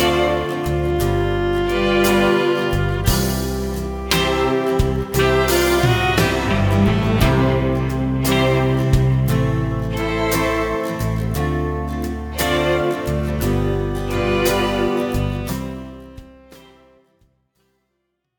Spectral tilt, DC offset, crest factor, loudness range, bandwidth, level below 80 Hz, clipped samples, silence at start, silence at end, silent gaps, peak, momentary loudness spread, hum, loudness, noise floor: -5.5 dB/octave; under 0.1%; 18 dB; 5 LU; over 20 kHz; -28 dBFS; under 0.1%; 0 s; 1.8 s; none; 0 dBFS; 7 LU; none; -19 LUFS; -73 dBFS